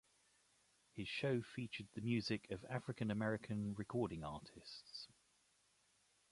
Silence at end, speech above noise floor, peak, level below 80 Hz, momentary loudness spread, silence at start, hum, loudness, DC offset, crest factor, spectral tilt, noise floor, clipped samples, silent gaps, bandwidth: 1.25 s; 34 dB; -26 dBFS; -70 dBFS; 13 LU; 0.95 s; none; -44 LUFS; under 0.1%; 18 dB; -6.5 dB/octave; -78 dBFS; under 0.1%; none; 11.5 kHz